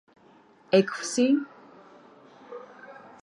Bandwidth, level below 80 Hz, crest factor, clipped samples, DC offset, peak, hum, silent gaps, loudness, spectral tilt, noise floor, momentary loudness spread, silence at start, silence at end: 11.5 kHz; -80 dBFS; 22 dB; under 0.1%; under 0.1%; -8 dBFS; none; none; -25 LUFS; -4.5 dB/octave; -57 dBFS; 23 LU; 0.7 s; 0.3 s